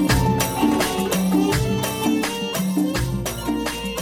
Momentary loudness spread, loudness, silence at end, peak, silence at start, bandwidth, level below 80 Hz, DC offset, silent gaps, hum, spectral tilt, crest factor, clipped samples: 6 LU; -21 LUFS; 0 s; -6 dBFS; 0 s; 17 kHz; -34 dBFS; under 0.1%; none; none; -5 dB/octave; 16 dB; under 0.1%